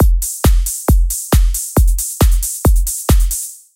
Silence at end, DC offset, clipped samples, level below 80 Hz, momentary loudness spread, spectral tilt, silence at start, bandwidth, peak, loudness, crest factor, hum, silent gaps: 0.2 s; under 0.1%; under 0.1%; -14 dBFS; 2 LU; -5 dB/octave; 0 s; 17 kHz; 0 dBFS; -15 LUFS; 12 dB; none; none